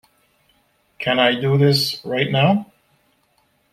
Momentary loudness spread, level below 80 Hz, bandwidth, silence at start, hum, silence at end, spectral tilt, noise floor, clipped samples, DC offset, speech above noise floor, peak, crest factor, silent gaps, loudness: 7 LU; -60 dBFS; 14.5 kHz; 1 s; none; 1.1 s; -5.5 dB/octave; -63 dBFS; under 0.1%; under 0.1%; 46 dB; -2 dBFS; 18 dB; none; -18 LUFS